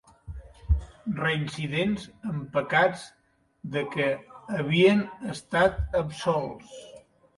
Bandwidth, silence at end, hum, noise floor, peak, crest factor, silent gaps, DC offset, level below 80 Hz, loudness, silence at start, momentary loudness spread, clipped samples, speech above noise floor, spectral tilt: 11.5 kHz; 0.4 s; none; -45 dBFS; -8 dBFS; 20 dB; none; under 0.1%; -40 dBFS; -27 LUFS; 0.25 s; 22 LU; under 0.1%; 19 dB; -6 dB/octave